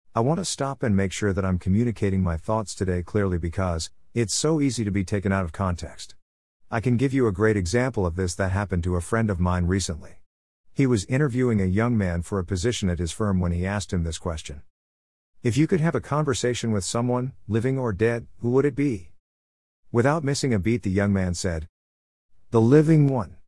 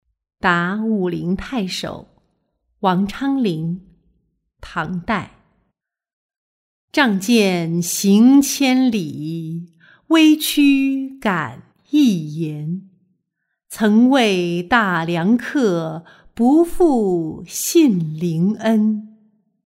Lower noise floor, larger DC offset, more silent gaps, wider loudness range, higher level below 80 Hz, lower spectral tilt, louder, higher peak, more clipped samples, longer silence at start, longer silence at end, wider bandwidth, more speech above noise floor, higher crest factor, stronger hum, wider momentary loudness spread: first, under -90 dBFS vs -75 dBFS; first, 0.3% vs under 0.1%; first, 6.22-6.60 s, 10.26-10.64 s, 14.70-15.33 s, 19.20-19.83 s, 21.69-22.29 s vs 6.13-6.29 s, 6.36-6.88 s; second, 2 LU vs 8 LU; about the same, -46 dBFS vs -48 dBFS; about the same, -6 dB/octave vs -5 dB/octave; second, -24 LUFS vs -17 LUFS; second, -6 dBFS vs -2 dBFS; neither; second, 0.15 s vs 0.45 s; second, 0.15 s vs 0.6 s; second, 12 kHz vs 16 kHz; first, over 67 dB vs 58 dB; about the same, 18 dB vs 16 dB; neither; second, 7 LU vs 14 LU